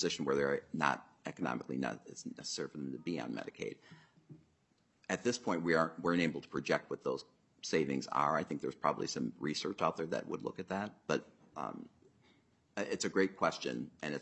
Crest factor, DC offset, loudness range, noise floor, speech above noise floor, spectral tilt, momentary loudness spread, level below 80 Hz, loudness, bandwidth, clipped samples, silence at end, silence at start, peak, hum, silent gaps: 24 dB; under 0.1%; 6 LU; -75 dBFS; 38 dB; -4.5 dB/octave; 12 LU; -76 dBFS; -37 LUFS; 8.4 kHz; under 0.1%; 0 s; 0 s; -14 dBFS; none; none